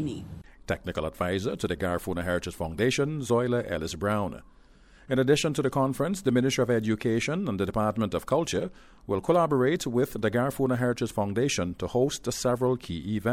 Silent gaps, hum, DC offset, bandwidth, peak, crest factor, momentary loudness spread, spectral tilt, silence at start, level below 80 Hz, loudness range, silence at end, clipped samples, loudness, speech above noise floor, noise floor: none; none; under 0.1%; 16 kHz; -10 dBFS; 16 dB; 8 LU; -5.5 dB/octave; 0 s; -50 dBFS; 3 LU; 0 s; under 0.1%; -27 LUFS; 28 dB; -55 dBFS